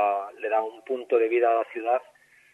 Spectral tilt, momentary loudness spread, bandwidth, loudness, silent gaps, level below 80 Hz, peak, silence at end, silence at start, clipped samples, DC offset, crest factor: -5 dB/octave; 8 LU; 4 kHz; -26 LUFS; none; -86 dBFS; -10 dBFS; 0.5 s; 0 s; under 0.1%; under 0.1%; 16 dB